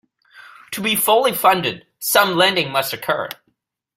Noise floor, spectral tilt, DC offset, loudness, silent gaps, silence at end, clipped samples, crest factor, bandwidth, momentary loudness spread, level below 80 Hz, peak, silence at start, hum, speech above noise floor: -69 dBFS; -2.5 dB/octave; under 0.1%; -17 LUFS; none; 0.65 s; under 0.1%; 18 dB; 16.5 kHz; 12 LU; -62 dBFS; 0 dBFS; 0.35 s; none; 51 dB